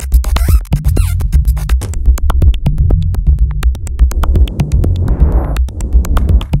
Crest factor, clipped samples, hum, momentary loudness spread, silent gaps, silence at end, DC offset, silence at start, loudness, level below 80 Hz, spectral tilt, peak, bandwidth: 10 dB; 0.5%; none; 3 LU; none; 0 s; under 0.1%; 0 s; -14 LUFS; -12 dBFS; -6.5 dB/octave; 0 dBFS; 16 kHz